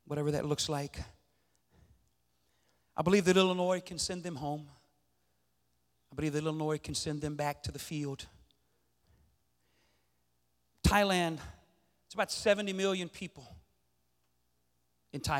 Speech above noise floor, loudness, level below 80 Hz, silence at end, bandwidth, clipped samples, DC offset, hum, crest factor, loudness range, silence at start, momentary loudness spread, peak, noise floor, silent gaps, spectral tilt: 46 dB; -33 LUFS; -52 dBFS; 0 s; 16.5 kHz; under 0.1%; under 0.1%; 60 Hz at -60 dBFS; 24 dB; 7 LU; 0.1 s; 18 LU; -12 dBFS; -78 dBFS; none; -4.5 dB/octave